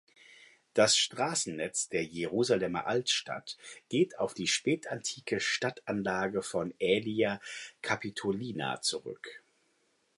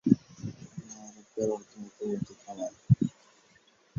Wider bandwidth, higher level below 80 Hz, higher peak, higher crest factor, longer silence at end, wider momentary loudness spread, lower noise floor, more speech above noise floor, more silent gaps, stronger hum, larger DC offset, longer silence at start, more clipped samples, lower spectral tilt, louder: first, 11.5 kHz vs 7.6 kHz; second, -70 dBFS vs -58 dBFS; second, -12 dBFS vs -6 dBFS; second, 20 dB vs 26 dB; about the same, 0.8 s vs 0.9 s; second, 11 LU vs 19 LU; first, -73 dBFS vs -63 dBFS; first, 41 dB vs 28 dB; neither; neither; neither; first, 0.3 s vs 0.05 s; neither; second, -3 dB/octave vs -8.5 dB/octave; about the same, -31 LUFS vs -32 LUFS